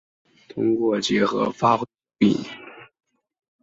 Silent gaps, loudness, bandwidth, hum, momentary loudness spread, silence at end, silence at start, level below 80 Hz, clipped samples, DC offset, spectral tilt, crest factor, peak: none; -22 LUFS; 7.8 kHz; none; 16 LU; 0.8 s; 0.55 s; -62 dBFS; under 0.1%; under 0.1%; -5.5 dB/octave; 20 dB; -4 dBFS